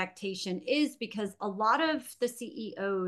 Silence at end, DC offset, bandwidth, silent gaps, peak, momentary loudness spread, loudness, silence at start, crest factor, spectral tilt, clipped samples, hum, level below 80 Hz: 0 s; under 0.1%; 12.5 kHz; none; -14 dBFS; 9 LU; -32 LUFS; 0 s; 18 dB; -4.5 dB/octave; under 0.1%; none; -80 dBFS